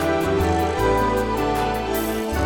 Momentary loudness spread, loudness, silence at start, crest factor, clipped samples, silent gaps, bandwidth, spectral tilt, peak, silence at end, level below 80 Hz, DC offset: 4 LU; -21 LUFS; 0 s; 12 dB; under 0.1%; none; over 20 kHz; -5.5 dB/octave; -8 dBFS; 0 s; -34 dBFS; under 0.1%